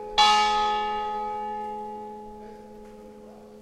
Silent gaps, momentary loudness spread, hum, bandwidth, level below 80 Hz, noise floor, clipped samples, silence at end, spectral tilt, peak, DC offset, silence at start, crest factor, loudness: none; 27 LU; none; 12.5 kHz; -52 dBFS; -46 dBFS; under 0.1%; 0 s; -1 dB/octave; -8 dBFS; under 0.1%; 0 s; 20 dB; -24 LUFS